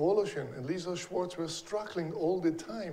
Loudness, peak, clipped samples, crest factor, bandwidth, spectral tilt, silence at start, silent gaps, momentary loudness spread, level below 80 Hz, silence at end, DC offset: -34 LUFS; -18 dBFS; under 0.1%; 16 dB; 13.5 kHz; -5.5 dB/octave; 0 s; none; 7 LU; -66 dBFS; 0 s; under 0.1%